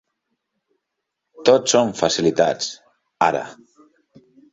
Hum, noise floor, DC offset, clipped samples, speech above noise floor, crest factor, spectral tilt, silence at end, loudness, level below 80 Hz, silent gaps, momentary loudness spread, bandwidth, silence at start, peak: none; -79 dBFS; under 0.1%; under 0.1%; 61 dB; 20 dB; -3.5 dB/octave; 1 s; -19 LUFS; -60 dBFS; none; 12 LU; 8 kHz; 1.4 s; -2 dBFS